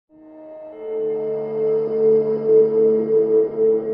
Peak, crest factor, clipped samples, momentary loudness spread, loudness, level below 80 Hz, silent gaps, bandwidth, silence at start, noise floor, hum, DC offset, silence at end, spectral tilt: -6 dBFS; 12 dB; under 0.1%; 13 LU; -18 LUFS; -66 dBFS; none; 2.3 kHz; 0.25 s; -40 dBFS; none; under 0.1%; 0 s; -11.5 dB/octave